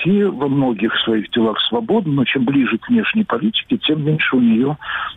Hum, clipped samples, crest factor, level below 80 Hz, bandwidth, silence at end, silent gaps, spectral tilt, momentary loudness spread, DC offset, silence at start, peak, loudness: none; under 0.1%; 10 dB; -54 dBFS; 4 kHz; 0 s; none; -8.5 dB/octave; 3 LU; under 0.1%; 0 s; -8 dBFS; -17 LUFS